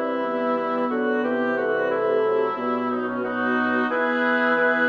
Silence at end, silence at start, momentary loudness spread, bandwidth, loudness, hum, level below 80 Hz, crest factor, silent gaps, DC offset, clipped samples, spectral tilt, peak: 0 s; 0 s; 5 LU; 6.2 kHz; -23 LUFS; none; -70 dBFS; 14 dB; none; under 0.1%; under 0.1%; -6.5 dB/octave; -10 dBFS